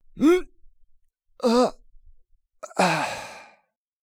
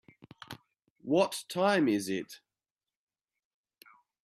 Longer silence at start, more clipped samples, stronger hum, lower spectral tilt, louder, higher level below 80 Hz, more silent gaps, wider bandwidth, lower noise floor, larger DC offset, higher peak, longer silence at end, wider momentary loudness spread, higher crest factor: second, 0.15 s vs 0.5 s; neither; neither; about the same, -5 dB/octave vs -5 dB/octave; first, -23 LUFS vs -30 LUFS; first, -52 dBFS vs -78 dBFS; second, none vs 0.90-0.96 s; first, 19 kHz vs 14.5 kHz; second, -65 dBFS vs under -90 dBFS; neither; first, -8 dBFS vs -14 dBFS; second, 0.6 s vs 1.85 s; about the same, 20 LU vs 21 LU; about the same, 18 dB vs 20 dB